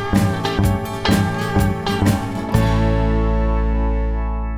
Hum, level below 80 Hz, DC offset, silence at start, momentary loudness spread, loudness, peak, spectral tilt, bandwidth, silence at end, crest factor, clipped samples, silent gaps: none; -22 dBFS; under 0.1%; 0 s; 4 LU; -19 LUFS; -2 dBFS; -6.5 dB/octave; 16 kHz; 0 s; 16 dB; under 0.1%; none